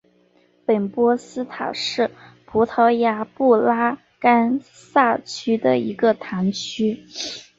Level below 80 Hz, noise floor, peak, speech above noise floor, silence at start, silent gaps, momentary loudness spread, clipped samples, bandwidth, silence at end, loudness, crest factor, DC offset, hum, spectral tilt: -62 dBFS; -58 dBFS; -2 dBFS; 39 dB; 0.7 s; none; 10 LU; under 0.1%; 7.8 kHz; 0.15 s; -20 LUFS; 18 dB; under 0.1%; none; -5 dB/octave